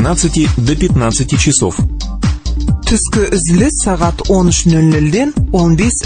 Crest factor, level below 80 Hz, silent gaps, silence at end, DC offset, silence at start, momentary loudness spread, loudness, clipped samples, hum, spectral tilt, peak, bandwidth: 12 dB; -20 dBFS; none; 0 s; under 0.1%; 0 s; 7 LU; -12 LUFS; under 0.1%; none; -5 dB/octave; 0 dBFS; 9.6 kHz